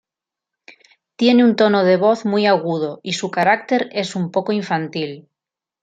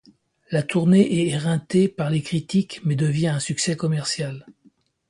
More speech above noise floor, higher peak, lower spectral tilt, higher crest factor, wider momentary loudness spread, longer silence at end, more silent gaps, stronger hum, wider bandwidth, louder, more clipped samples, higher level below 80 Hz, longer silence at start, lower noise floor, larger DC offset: first, 70 dB vs 38 dB; about the same, -2 dBFS vs -4 dBFS; about the same, -5.5 dB/octave vs -6 dB/octave; about the same, 16 dB vs 18 dB; about the same, 10 LU vs 9 LU; about the same, 0.6 s vs 0.6 s; neither; neither; second, 9 kHz vs 11.5 kHz; first, -17 LUFS vs -22 LUFS; neither; second, -68 dBFS vs -60 dBFS; first, 1.2 s vs 0.5 s; first, -87 dBFS vs -59 dBFS; neither